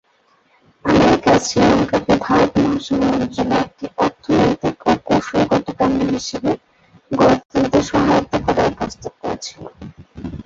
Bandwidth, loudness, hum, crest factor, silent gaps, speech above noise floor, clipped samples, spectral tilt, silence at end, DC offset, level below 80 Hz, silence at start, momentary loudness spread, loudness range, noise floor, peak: 8 kHz; -17 LUFS; none; 16 dB; 7.45-7.49 s; 42 dB; under 0.1%; -5.5 dB/octave; 0.05 s; under 0.1%; -40 dBFS; 0.85 s; 12 LU; 3 LU; -58 dBFS; -2 dBFS